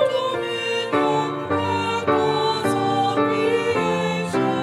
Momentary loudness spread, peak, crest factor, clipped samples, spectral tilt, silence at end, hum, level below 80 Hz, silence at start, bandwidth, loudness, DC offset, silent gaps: 4 LU; -6 dBFS; 14 dB; under 0.1%; -5.5 dB/octave; 0 s; none; -62 dBFS; 0 s; 14 kHz; -21 LUFS; under 0.1%; none